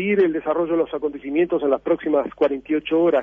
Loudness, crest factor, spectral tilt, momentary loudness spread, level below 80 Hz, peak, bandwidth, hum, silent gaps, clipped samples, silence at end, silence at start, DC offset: -21 LUFS; 14 dB; -8.5 dB/octave; 5 LU; -56 dBFS; -6 dBFS; 3.7 kHz; none; none; under 0.1%; 0 s; 0 s; under 0.1%